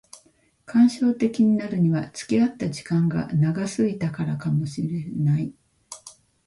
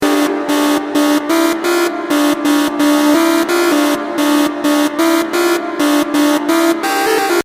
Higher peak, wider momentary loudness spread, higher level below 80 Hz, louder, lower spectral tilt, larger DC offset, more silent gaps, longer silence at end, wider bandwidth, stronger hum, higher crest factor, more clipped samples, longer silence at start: second, -8 dBFS vs -2 dBFS; first, 10 LU vs 3 LU; about the same, -58 dBFS vs -56 dBFS; second, -23 LUFS vs -13 LUFS; first, -7.5 dB/octave vs -2.5 dB/octave; neither; neither; first, 0.35 s vs 0 s; second, 11.5 kHz vs 16 kHz; neither; about the same, 14 dB vs 12 dB; neither; first, 0.7 s vs 0 s